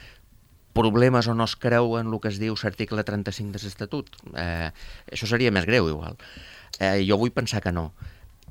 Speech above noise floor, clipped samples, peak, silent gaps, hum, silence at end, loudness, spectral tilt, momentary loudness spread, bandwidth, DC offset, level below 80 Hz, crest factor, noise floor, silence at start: 30 dB; under 0.1%; -4 dBFS; none; none; 0.25 s; -25 LUFS; -6 dB/octave; 18 LU; 16.5 kHz; under 0.1%; -48 dBFS; 22 dB; -55 dBFS; 0 s